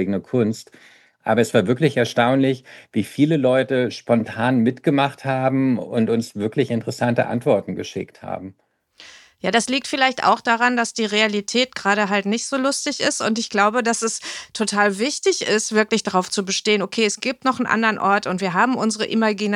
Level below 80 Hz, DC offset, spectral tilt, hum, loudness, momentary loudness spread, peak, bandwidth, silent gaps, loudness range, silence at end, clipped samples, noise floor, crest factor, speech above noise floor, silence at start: -68 dBFS; under 0.1%; -4 dB/octave; none; -20 LUFS; 7 LU; -2 dBFS; 12.5 kHz; none; 3 LU; 0 s; under 0.1%; -47 dBFS; 18 dB; 27 dB; 0 s